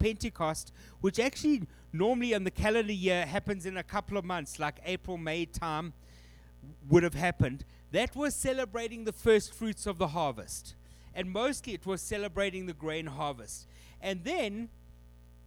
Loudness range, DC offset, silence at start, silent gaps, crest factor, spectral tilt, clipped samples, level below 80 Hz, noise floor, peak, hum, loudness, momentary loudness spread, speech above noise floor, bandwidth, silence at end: 5 LU; under 0.1%; 0 s; none; 22 dB; -5 dB/octave; under 0.1%; -50 dBFS; -55 dBFS; -12 dBFS; 60 Hz at -55 dBFS; -32 LUFS; 13 LU; 23 dB; 18.5 kHz; 0.35 s